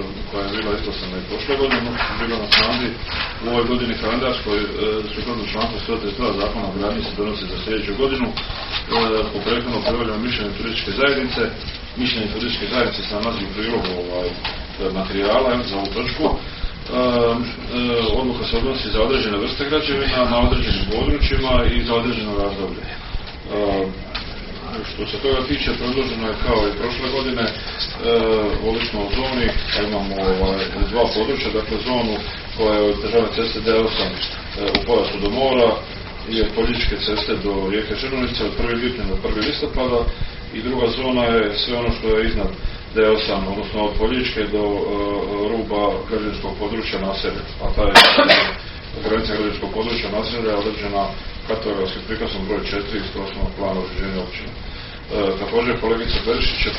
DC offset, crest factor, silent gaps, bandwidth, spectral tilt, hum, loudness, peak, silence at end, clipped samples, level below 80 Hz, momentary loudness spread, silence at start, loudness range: under 0.1%; 20 dB; none; 6 kHz; -3 dB/octave; none; -20 LUFS; 0 dBFS; 0 s; under 0.1%; -30 dBFS; 9 LU; 0 s; 7 LU